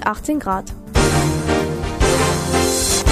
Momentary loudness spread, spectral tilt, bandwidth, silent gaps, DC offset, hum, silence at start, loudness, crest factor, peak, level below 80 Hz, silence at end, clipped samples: 7 LU; -4 dB/octave; 15.5 kHz; none; under 0.1%; none; 0 s; -18 LUFS; 16 dB; -2 dBFS; -26 dBFS; 0 s; under 0.1%